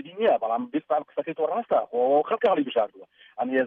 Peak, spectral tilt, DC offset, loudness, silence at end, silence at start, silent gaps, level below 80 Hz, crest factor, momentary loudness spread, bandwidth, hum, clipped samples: -10 dBFS; -7.5 dB/octave; under 0.1%; -25 LUFS; 0 s; 0 s; none; -72 dBFS; 14 dB; 9 LU; 4.6 kHz; none; under 0.1%